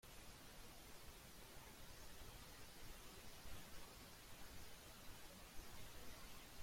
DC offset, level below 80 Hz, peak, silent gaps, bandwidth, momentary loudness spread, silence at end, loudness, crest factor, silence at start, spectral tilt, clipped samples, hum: under 0.1%; -64 dBFS; -40 dBFS; none; 16.5 kHz; 2 LU; 0 s; -59 LUFS; 16 dB; 0.05 s; -3 dB/octave; under 0.1%; none